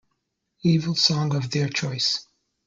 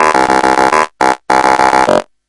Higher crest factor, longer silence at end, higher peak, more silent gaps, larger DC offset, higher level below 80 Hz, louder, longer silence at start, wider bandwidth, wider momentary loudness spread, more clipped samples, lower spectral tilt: first, 20 dB vs 10 dB; first, 0.45 s vs 0.25 s; second, -6 dBFS vs 0 dBFS; neither; neither; second, -62 dBFS vs -42 dBFS; second, -23 LUFS vs -10 LUFS; first, 0.65 s vs 0 s; second, 7.6 kHz vs 12 kHz; about the same, 6 LU vs 4 LU; second, under 0.1% vs 0.6%; about the same, -4.5 dB/octave vs -3.5 dB/octave